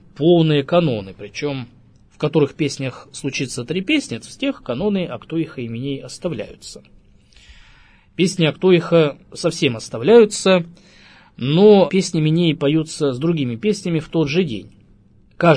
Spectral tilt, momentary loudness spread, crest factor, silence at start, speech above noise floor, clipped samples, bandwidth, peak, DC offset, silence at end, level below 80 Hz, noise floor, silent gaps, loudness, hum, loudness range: -6 dB/octave; 14 LU; 18 dB; 0.2 s; 33 dB; under 0.1%; 10.5 kHz; 0 dBFS; under 0.1%; 0 s; -52 dBFS; -51 dBFS; none; -18 LUFS; none; 10 LU